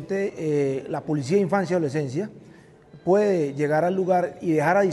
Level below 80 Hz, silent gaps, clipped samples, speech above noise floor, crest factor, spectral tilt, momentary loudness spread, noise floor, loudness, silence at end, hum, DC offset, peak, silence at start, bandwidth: -66 dBFS; none; under 0.1%; 26 dB; 14 dB; -7 dB/octave; 9 LU; -49 dBFS; -23 LUFS; 0 s; none; under 0.1%; -8 dBFS; 0 s; 12 kHz